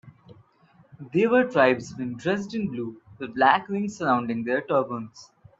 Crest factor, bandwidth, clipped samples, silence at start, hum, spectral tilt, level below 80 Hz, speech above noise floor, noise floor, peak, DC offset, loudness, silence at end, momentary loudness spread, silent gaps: 22 dB; 8 kHz; under 0.1%; 0.05 s; none; -6 dB/octave; -66 dBFS; 35 dB; -59 dBFS; -4 dBFS; under 0.1%; -24 LUFS; 0.35 s; 15 LU; none